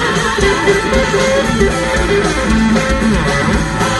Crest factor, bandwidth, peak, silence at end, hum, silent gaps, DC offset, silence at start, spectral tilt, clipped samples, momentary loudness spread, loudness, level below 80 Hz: 12 dB; 12 kHz; 0 dBFS; 0 s; none; none; under 0.1%; 0 s; -4.5 dB/octave; under 0.1%; 2 LU; -13 LUFS; -22 dBFS